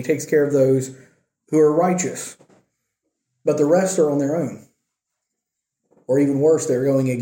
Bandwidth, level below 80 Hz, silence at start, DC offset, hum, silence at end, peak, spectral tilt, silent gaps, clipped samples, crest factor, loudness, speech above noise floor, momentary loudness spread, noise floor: 16.5 kHz; -66 dBFS; 0 s; under 0.1%; none; 0 s; -4 dBFS; -6.5 dB/octave; none; under 0.1%; 16 dB; -19 LUFS; 63 dB; 10 LU; -81 dBFS